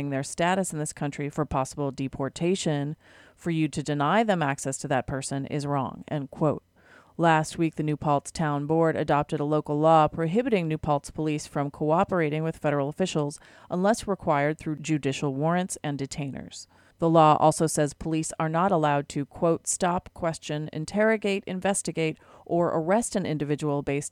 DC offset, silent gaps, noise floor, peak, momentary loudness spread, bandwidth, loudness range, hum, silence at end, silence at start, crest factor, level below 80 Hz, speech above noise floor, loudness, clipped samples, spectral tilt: under 0.1%; none; -56 dBFS; -6 dBFS; 9 LU; 14.5 kHz; 4 LU; none; 0.05 s; 0 s; 20 dB; -54 dBFS; 30 dB; -26 LUFS; under 0.1%; -5.5 dB/octave